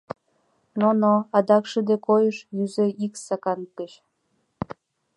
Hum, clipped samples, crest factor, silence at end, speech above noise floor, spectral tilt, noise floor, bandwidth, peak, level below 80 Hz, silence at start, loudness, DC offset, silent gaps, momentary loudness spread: none; under 0.1%; 20 dB; 1.3 s; 49 dB; -6.5 dB/octave; -71 dBFS; 11.5 kHz; -4 dBFS; -66 dBFS; 0.75 s; -22 LUFS; under 0.1%; none; 17 LU